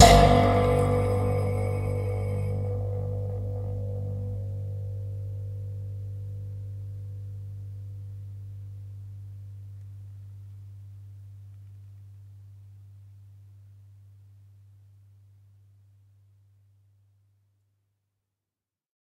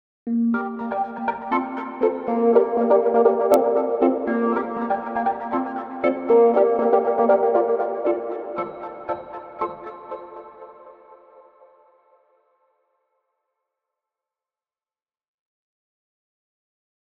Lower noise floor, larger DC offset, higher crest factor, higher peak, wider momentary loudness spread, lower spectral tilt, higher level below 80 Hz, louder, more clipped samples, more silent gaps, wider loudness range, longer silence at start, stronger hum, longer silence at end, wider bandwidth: about the same, under -90 dBFS vs under -90 dBFS; neither; first, 28 dB vs 22 dB; about the same, 0 dBFS vs -2 dBFS; first, 24 LU vs 15 LU; second, -5.5 dB/octave vs -7 dB/octave; first, -40 dBFS vs -66 dBFS; second, -28 LUFS vs -21 LUFS; neither; neither; first, 24 LU vs 15 LU; second, 0 s vs 0.25 s; neither; second, 5.35 s vs 6.1 s; first, 15.5 kHz vs 11.5 kHz